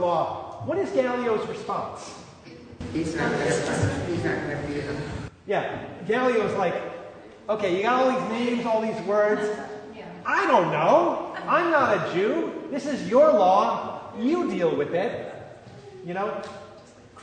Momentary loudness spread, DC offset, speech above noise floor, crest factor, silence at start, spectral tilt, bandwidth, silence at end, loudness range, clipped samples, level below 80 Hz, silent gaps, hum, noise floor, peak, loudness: 19 LU; under 0.1%; 24 dB; 20 dB; 0 s; -5.5 dB/octave; 9.6 kHz; 0 s; 6 LU; under 0.1%; -56 dBFS; none; none; -48 dBFS; -6 dBFS; -24 LUFS